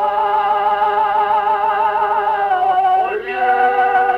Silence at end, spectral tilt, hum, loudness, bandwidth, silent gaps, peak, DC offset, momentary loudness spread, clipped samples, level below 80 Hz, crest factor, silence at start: 0 s; -4.5 dB/octave; none; -16 LUFS; 5.6 kHz; none; -4 dBFS; under 0.1%; 3 LU; under 0.1%; -54 dBFS; 12 dB; 0 s